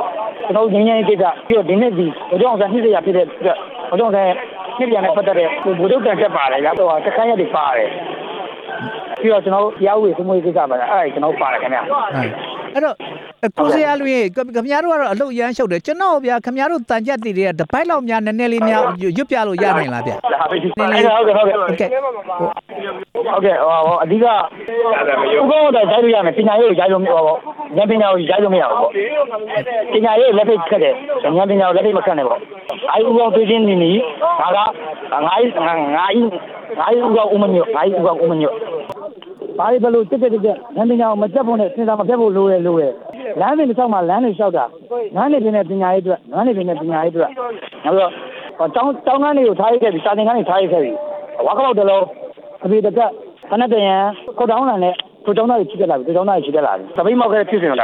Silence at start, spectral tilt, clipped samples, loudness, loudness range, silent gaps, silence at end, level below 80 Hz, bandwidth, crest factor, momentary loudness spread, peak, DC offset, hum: 0 s; -7 dB/octave; under 0.1%; -15 LUFS; 4 LU; none; 0 s; -60 dBFS; 9.4 kHz; 14 dB; 9 LU; -2 dBFS; under 0.1%; none